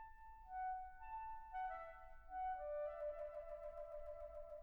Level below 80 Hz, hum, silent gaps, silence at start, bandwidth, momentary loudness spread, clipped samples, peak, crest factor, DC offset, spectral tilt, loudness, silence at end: -64 dBFS; none; none; 0 s; 19 kHz; 8 LU; under 0.1%; -38 dBFS; 12 dB; under 0.1%; -5.5 dB/octave; -50 LUFS; 0 s